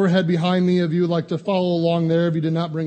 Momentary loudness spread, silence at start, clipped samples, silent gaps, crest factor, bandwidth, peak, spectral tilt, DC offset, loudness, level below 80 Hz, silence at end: 4 LU; 0 s; under 0.1%; none; 14 dB; 8.4 kHz; -6 dBFS; -8 dB/octave; under 0.1%; -20 LUFS; -62 dBFS; 0 s